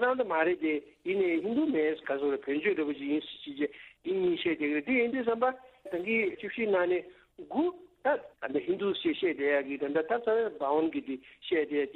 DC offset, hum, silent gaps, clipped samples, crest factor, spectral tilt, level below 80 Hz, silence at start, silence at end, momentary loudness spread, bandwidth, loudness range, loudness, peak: under 0.1%; none; none; under 0.1%; 16 dB; -7.5 dB/octave; -70 dBFS; 0 s; 0 s; 7 LU; 4.3 kHz; 2 LU; -31 LUFS; -14 dBFS